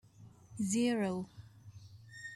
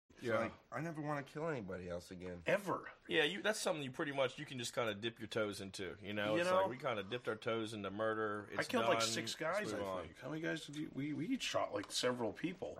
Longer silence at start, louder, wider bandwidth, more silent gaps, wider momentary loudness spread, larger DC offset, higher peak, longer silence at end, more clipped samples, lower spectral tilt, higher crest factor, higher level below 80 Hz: about the same, 0.2 s vs 0.15 s; first, -35 LUFS vs -40 LUFS; second, 14 kHz vs 16 kHz; neither; first, 24 LU vs 10 LU; neither; about the same, -22 dBFS vs -20 dBFS; about the same, 0 s vs 0 s; neither; about the same, -5 dB/octave vs -4 dB/octave; about the same, 16 dB vs 20 dB; about the same, -72 dBFS vs -74 dBFS